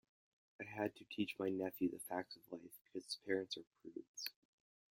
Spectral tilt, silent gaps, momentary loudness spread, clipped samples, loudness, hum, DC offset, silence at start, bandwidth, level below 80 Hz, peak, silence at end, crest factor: -4 dB/octave; 2.81-2.85 s, 3.67-3.71 s, 4.08-4.14 s; 12 LU; under 0.1%; -45 LUFS; none; under 0.1%; 0.6 s; 16.5 kHz; -86 dBFS; -24 dBFS; 0.6 s; 22 dB